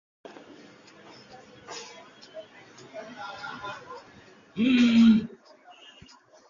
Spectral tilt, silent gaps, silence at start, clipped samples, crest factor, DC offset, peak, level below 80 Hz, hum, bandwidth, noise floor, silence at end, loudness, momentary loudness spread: -5.5 dB/octave; none; 1.7 s; under 0.1%; 18 dB; under 0.1%; -10 dBFS; -66 dBFS; none; 7.4 kHz; -54 dBFS; 1.2 s; -23 LUFS; 29 LU